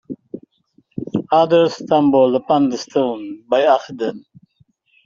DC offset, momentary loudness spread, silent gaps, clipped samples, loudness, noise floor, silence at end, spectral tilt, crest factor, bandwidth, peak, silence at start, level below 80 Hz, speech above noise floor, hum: under 0.1%; 19 LU; none; under 0.1%; -17 LUFS; -59 dBFS; 0.85 s; -6 dB/octave; 16 dB; 7.4 kHz; -2 dBFS; 0.1 s; -60 dBFS; 43 dB; none